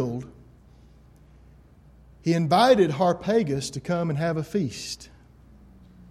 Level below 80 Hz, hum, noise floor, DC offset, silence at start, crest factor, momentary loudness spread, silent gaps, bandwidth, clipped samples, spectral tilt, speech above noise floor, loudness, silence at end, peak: -54 dBFS; none; -52 dBFS; under 0.1%; 0 s; 20 dB; 16 LU; none; 13.5 kHz; under 0.1%; -6 dB/octave; 29 dB; -24 LUFS; 1.05 s; -6 dBFS